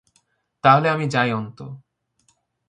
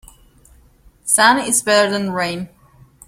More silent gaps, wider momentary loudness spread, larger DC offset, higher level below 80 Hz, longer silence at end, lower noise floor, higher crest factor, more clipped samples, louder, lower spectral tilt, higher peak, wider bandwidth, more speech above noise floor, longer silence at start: neither; first, 22 LU vs 17 LU; neither; second, -64 dBFS vs -52 dBFS; first, 0.9 s vs 0.6 s; first, -66 dBFS vs -50 dBFS; about the same, 20 dB vs 20 dB; neither; second, -19 LUFS vs -15 LUFS; first, -6.5 dB/octave vs -2 dB/octave; about the same, -2 dBFS vs 0 dBFS; second, 10.5 kHz vs 16.5 kHz; first, 47 dB vs 34 dB; second, 0.65 s vs 1.05 s